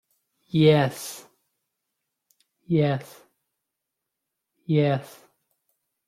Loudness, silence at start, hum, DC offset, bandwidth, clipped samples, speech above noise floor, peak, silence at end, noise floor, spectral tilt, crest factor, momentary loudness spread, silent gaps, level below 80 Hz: -23 LUFS; 0.55 s; none; under 0.1%; 15.5 kHz; under 0.1%; 61 dB; -6 dBFS; 1.05 s; -83 dBFS; -6.5 dB/octave; 22 dB; 18 LU; none; -66 dBFS